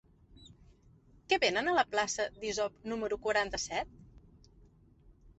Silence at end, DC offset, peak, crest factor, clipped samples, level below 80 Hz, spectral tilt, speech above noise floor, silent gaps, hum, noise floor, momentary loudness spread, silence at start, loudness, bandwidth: 0.1 s; under 0.1%; -14 dBFS; 22 dB; under 0.1%; -60 dBFS; -2 dB/octave; 30 dB; none; none; -62 dBFS; 9 LU; 0.4 s; -32 LUFS; 8.2 kHz